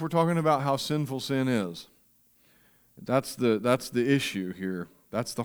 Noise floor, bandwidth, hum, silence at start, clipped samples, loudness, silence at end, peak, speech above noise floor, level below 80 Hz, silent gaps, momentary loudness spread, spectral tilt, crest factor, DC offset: -64 dBFS; over 20 kHz; none; 0 s; under 0.1%; -28 LUFS; 0 s; -10 dBFS; 37 dB; -66 dBFS; none; 10 LU; -5.5 dB/octave; 20 dB; under 0.1%